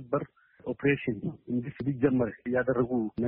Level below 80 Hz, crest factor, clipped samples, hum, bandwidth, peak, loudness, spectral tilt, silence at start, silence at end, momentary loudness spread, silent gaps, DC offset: -58 dBFS; 18 dB; under 0.1%; none; 4 kHz; -12 dBFS; -30 LUFS; -7.5 dB/octave; 0 s; 0 s; 10 LU; none; under 0.1%